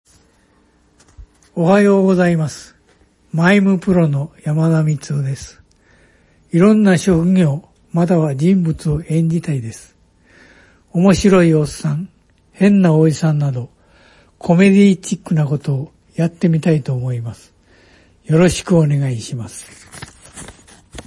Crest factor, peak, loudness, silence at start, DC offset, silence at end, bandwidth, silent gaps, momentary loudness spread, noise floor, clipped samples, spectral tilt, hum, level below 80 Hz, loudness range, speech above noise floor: 16 dB; 0 dBFS; -15 LUFS; 1.2 s; under 0.1%; 0.05 s; 11.5 kHz; none; 19 LU; -55 dBFS; under 0.1%; -7 dB/octave; none; -44 dBFS; 4 LU; 41 dB